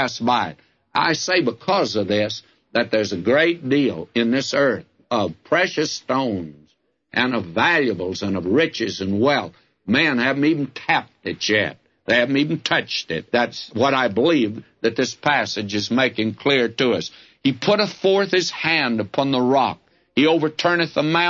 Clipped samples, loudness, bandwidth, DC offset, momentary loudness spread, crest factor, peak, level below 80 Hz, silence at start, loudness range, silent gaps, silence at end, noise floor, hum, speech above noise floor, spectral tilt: under 0.1%; -20 LUFS; 7.6 kHz; under 0.1%; 7 LU; 18 dB; -4 dBFS; -62 dBFS; 0 s; 2 LU; none; 0 s; -62 dBFS; none; 42 dB; -4.5 dB/octave